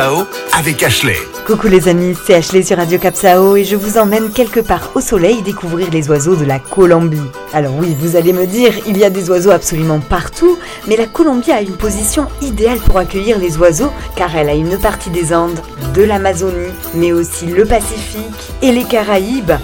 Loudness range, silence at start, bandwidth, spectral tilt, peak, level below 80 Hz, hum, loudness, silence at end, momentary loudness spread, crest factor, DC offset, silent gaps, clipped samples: 4 LU; 0 s; 17.5 kHz; -5 dB/octave; 0 dBFS; -26 dBFS; none; -12 LUFS; 0 s; 8 LU; 12 dB; under 0.1%; none; 0.2%